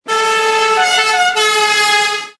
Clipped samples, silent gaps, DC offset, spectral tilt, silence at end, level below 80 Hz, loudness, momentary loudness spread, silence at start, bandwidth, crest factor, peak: under 0.1%; none; under 0.1%; 1 dB/octave; 0.1 s; -60 dBFS; -11 LUFS; 2 LU; 0.05 s; 11 kHz; 12 dB; -2 dBFS